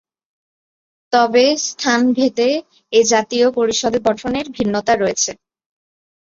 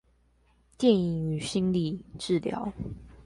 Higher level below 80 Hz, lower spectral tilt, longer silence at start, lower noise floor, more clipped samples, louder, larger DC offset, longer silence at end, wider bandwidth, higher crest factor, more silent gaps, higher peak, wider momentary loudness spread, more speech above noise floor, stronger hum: about the same, -54 dBFS vs -52 dBFS; second, -3 dB/octave vs -6.5 dB/octave; first, 1.1 s vs 0.8 s; first, under -90 dBFS vs -65 dBFS; neither; first, -16 LUFS vs -28 LUFS; neither; first, 1.05 s vs 0.05 s; second, 7.8 kHz vs 11.5 kHz; about the same, 16 dB vs 20 dB; neither; first, -2 dBFS vs -10 dBFS; second, 7 LU vs 13 LU; first, over 74 dB vs 37 dB; neither